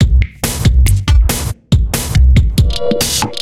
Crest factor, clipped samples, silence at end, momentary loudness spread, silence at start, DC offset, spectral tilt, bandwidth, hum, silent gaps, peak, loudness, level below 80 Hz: 10 dB; under 0.1%; 0 s; 5 LU; 0 s; under 0.1%; -5 dB/octave; 16.5 kHz; none; none; 0 dBFS; -13 LUFS; -14 dBFS